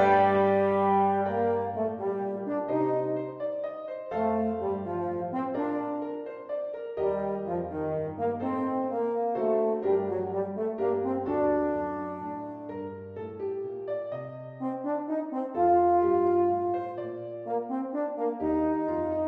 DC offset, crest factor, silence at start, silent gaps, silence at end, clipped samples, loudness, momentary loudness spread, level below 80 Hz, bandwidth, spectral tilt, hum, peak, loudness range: under 0.1%; 18 dB; 0 s; none; 0 s; under 0.1%; -29 LUFS; 12 LU; -62 dBFS; 5.2 kHz; -9.5 dB/octave; none; -10 dBFS; 5 LU